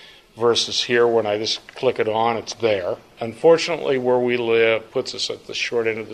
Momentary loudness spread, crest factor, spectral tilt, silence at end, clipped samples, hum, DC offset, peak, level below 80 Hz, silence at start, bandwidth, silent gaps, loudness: 8 LU; 16 dB; -3.5 dB/octave; 0 s; under 0.1%; none; under 0.1%; -4 dBFS; -62 dBFS; 0 s; 10.5 kHz; none; -20 LUFS